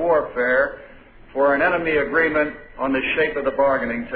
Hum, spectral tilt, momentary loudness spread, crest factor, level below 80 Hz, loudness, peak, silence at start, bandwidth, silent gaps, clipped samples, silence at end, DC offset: none; -8.5 dB/octave; 7 LU; 14 dB; -46 dBFS; -20 LUFS; -6 dBFS; 0 s; 4.8 kHz; none; under 0.1%; 0 s; under 0.1%